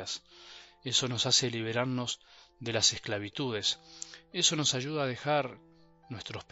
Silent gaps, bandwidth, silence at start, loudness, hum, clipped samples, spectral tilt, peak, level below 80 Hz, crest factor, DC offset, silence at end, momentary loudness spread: none; 8.2 kHz; 0 s; -30 LUFS; none; under 0.1%; -2.5 dB/octave; -12 dBFS; -68 dBFS; 22 dB; under 0.1%; 0.1 s; 18 LU